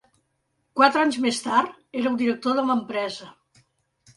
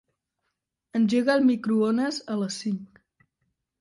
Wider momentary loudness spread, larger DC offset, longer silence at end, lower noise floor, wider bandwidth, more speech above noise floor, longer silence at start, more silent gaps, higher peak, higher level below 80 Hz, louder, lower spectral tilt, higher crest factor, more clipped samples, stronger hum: about the same, 12 LU vs 11 LU; neither; about the same, 0.85 s vs 0.95 s; second, -73 dBFS vs -81 dBFS; about the same, 11.5 kHz vs 11.5 kHz; second, 51 dB vs 57 dB; second, 0.75 s vs 0.95 s; neither; first, -4 dBFS vs -8 dBFS; about the same, -70 dBFS vs -72 dBFS; about the same, -23 LUFS vs -25 LUFS; second, -3.5 dB/octave vs -5.5 dB/octave; about the same, 20 dB vs 18 dB; neither; neither